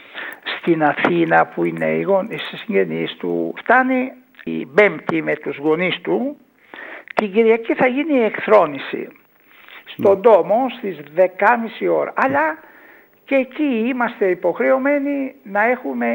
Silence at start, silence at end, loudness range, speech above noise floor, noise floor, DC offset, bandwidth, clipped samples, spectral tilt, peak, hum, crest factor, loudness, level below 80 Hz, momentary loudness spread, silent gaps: 0.1 s; 0 s; 3 LU; 31 dB; -48 dBFS; under 0.1%; 16.5 kHz; under 0.1%; -7.5 dB/octave; 0 dBFS; none; 18 dB; -18 LUFS; -70 dBFS; 13 LU; none